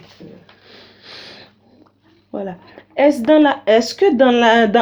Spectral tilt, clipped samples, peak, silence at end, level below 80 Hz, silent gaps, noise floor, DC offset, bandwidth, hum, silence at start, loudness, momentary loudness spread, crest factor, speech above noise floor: -4.5 dB/octave; under 0.1%; 0 dBFS; 0 s; -58 dBFS; none; -54 dBFS; under 0.1%; 19.5 kHz; none; 0.2 s; -13 LUFS; 21 LU; 16 dB; 41 dB